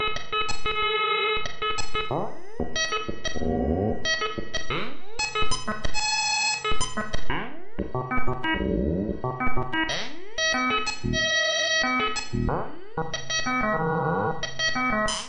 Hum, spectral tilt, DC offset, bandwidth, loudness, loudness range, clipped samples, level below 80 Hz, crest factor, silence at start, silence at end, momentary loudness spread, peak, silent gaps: none; -3 dB/octave; under 0.1%; 10.5 kHz; -26 LUFS; 4 LU; under 0.1%; -38 dBFS; 12 dB; 0 s; 0 s; 10 LU; -10 dBFS; none